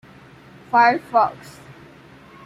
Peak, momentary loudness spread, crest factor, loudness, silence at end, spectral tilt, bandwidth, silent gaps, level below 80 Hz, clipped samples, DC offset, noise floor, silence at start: -4 dBFS; 9 LU; 18 dB; -18 LUFS; 0.75 s; -5 dB/octave; 14 kHz; none; -62 dBFS; under 0.1%; under 0.1%; -46 dBFS; 0.7 s